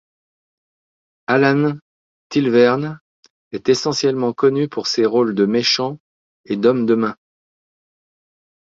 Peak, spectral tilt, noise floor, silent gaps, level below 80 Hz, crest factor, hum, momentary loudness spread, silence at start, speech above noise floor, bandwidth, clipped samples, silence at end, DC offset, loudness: -2 dBFS; -5 dB/octave; under -90 dBFS; 1.81-2.30 s, 3.01-3.23 s, 3.30-3.51 s, 6.00-6.44 s; -62 dBFS; 18 dB; none; 13 LU; 1.3 s; over 73 dB; 7.8 kHz; under 0.1%; 1.5 s; under 0.1%; -17 LUFS